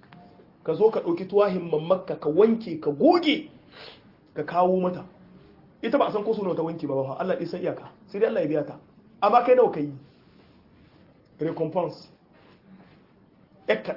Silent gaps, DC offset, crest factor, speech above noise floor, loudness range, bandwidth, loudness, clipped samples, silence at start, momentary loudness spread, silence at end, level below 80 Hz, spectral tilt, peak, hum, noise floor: none; under 0.1%; 20 dB; 33 dB; 9 LU; 5.8 kHz; -24 LUFS; under 0.1%; 0.65 s; 18 LU; 0 s; -68 dBFS; -8 dB/octave; -6 dBFS; none; -57 dBFS